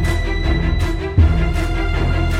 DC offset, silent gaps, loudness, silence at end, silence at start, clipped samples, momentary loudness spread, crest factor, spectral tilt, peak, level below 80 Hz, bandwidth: under 0.1%; none; -18 LUFS; 0 s; 0 s; under 0.1%; 5 LU; 14 dB; -6.5 dB/octave; -2 dBFS; -18 dBFS; 12.5 kHz